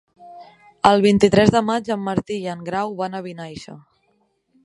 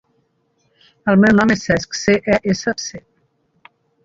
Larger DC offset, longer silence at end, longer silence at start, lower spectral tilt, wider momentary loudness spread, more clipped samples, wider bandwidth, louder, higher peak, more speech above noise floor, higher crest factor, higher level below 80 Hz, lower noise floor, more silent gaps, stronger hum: neither; second, 0.85 s vs 1.05 s; second, 0.2 s vs 1.05 s; about the same, -6 dB/octave vs -5.5 dB/octave; first, 20 LU vs 12 LU; neither; first, 11 kHz vs 7.6 kHz; second, -19 LUFS vs -16 LUFS; about the same, 0 dBFS vs -2 dBFS; about the same, 47 dB vs 48 dB; about the same, 20 dB vs 18 dB; about the same, -50 dBFS vs -48 dBFS; about the same, -65 dBFS vs -64 dBFS; neither; neither